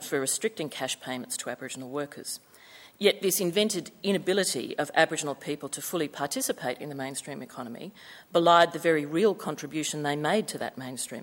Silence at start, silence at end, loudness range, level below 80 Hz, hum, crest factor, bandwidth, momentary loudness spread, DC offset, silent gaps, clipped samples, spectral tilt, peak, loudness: 0 s; 0 s; 5 LU; -74 dBFS; none; 24 dB; 19 kHz; 13 LU; under 0.1%; none; under 0.1%; -3 dB/octave; -4 dBFS; -28 LUFS